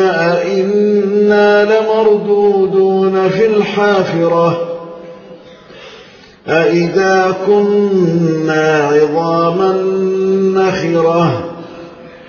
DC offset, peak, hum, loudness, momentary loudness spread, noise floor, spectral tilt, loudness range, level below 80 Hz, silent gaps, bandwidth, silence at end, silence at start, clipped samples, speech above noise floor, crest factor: under 0.1%; 0 dBFS; none; -12 LUFS; 7 LU; -39 dBFS; -6.5 dB/octave; 5 LU; -54 dBFS; none; 7 kHz; 0 s; 0 s; under 0.1%; 27 dB; 12 dB